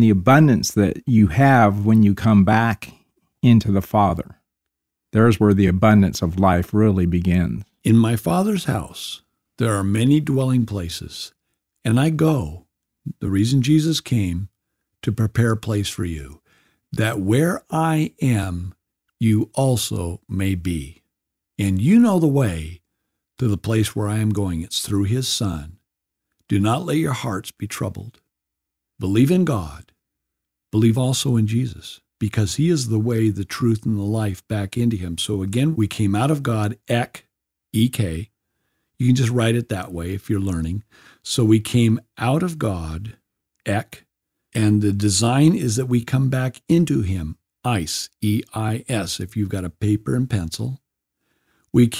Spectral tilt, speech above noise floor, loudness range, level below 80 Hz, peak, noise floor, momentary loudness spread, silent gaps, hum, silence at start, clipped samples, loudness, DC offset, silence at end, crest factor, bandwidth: -6 dB/octave; 64 dB; 6 LU; -44 dBFS; -2 dBFS; -83 dBFS; 14 LU; none; none; 0 s; under 0.1%; -20 LUFS; under 0.1%; 0 s; 18 dB; 16 kHz